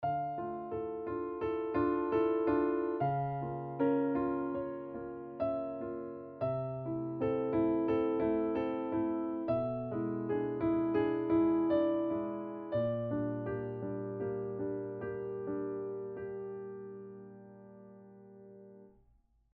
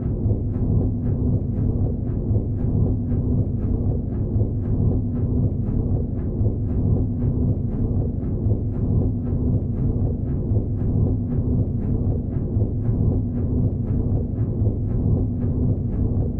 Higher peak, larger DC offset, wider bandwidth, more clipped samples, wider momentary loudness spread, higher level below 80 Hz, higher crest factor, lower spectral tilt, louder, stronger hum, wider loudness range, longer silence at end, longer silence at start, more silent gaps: second, -20 dBFS vs -8 dBFS; neither; first, 4.5 kHz vs 1.8 kHz; neither; first, 14 LU vs 2 LU; second, -64 dBFS vs -28 dBFS; about the same, 16 dB vs 12 dB; second, -8 dB/octave vs -14.5 dB/octave; second, -35 LUFS vs -23 LUFS; neither; first, 9 LU vs 0 LU; first, 0.65 s vs 0 s; about the same, 0 s vs 0 s; neither